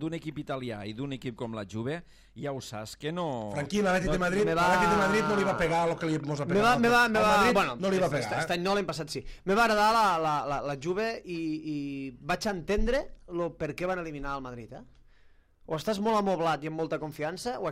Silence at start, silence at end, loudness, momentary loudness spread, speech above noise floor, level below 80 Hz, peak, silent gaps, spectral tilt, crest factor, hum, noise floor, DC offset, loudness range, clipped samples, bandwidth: 0 s; 0 s; -29 LUFS; 14 LU; 30 dB; -46 dBFS; -12 dBFS; none; -5 dB/octave; 16 dB; none; -58 dBFS; under 0.1%; 9 LU; under 0.1%; 16 kHz